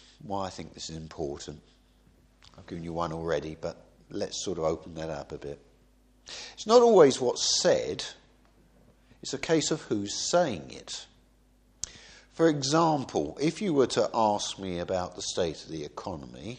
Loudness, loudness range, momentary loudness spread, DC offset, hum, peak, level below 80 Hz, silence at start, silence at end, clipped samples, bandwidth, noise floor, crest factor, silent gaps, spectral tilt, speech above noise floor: -28 LUFS; 12 LU; 17 LU; under 0.1%; none; -6 dBFS; -58 dBFS; 0.25 s; 0 s; under 0.1%; 9.8 kHz; -62 dBFS; 24 dB; none; -4 dB/octave; 34 dB